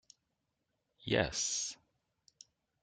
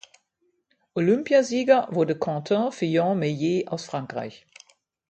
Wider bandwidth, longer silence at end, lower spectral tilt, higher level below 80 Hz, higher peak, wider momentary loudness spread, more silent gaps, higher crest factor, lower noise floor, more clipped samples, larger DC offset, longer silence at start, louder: first, 11 kHz vs 8.8 kHz; first, 1.1 s vs 0.75 s; second, -2.5 dB/octave vs -6 dB/octave; first, -62 dBFS vs -70 dBFS; second, -18 dBFS vs -6 dBFS; first, 17 LU vs 12 LU; neither; first, 24 dB vs 18 dB; first, -84 dBFS vs -72 dBFS; neither; neither; about the same, 1 s vs 0.95 s; second, -35 LUFS vs -24 LUFS